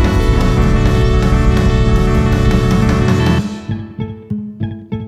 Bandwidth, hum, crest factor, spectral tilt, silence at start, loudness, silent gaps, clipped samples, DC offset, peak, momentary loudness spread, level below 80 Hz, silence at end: 14 kHz; none; 12 dB; -7 dB/octave; 0 s; -14 LUFS; none; under 0.1%; under 0.1%; 0 dBFS; 11 LU; -16 dBFS; 0 s